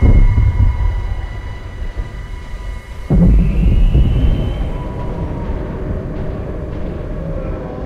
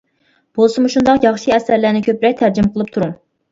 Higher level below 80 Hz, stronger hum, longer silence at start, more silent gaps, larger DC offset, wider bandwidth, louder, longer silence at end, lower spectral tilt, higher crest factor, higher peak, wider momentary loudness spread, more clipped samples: first, -16 dBFS vs -48 dBFS; neither; second, 0 s vs 0.55 s; neither; neither; second, 5.2 kHz vs 7.8 kHz; second, -18 LUFS vs -15 LUFS; second, 0 s vs 0.35 s; first, -9 dB/octave vs -6 dB/octave; about the same, 12 dB vs 14 dB; about the same, -2 dBFS vs 0 dBFS; first, 16 LU vs 8 LU; neither